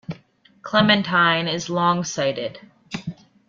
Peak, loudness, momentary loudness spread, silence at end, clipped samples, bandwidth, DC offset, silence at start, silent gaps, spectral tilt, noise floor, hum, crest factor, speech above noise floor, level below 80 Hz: -2 dBFS; -20 LUFS; 20 LU; 0.35 s; under 0.1%; 7.4 kHz; under 0.1%; 0.1 s; none; -4.5 dB/octave; -54 dBFS; none; 20 dB; 34 dB; -60 dBFS